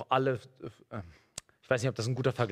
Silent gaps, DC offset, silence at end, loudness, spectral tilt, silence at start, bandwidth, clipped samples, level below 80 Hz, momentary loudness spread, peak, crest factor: none; under 0.1%; 0 s; -32 LUFS; -5.5 dB/octave; 0 s; 13.5 kHz; under 0.1%; -66 dBFS; 17 LU; -12 dBFS; 20 dB